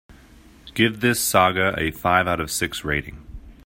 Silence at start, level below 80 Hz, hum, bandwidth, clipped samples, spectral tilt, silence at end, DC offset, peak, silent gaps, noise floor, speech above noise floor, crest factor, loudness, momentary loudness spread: 0.65 s; -44 dBFS; none; 16.5 kHz; under 0.1%; -3.5 dB/octave; 0.15 s; under 0.1%; -2 dBFS; none; -49 dBFS; 27 dB; 20 dB; -21 LUFS; 9 LU